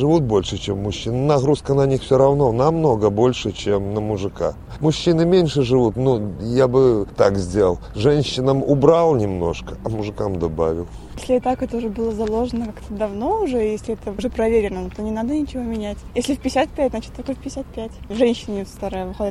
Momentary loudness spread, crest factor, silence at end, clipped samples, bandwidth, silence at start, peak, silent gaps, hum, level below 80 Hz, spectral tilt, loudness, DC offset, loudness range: 12 LU; 18 dB; 0 s; under 0.1%; 12.5 kHz; 0 s; 0 dBFS; none; none; -38 dBFS; -7 dB/octave; -20 LUFS; under 0.1%; 6 LU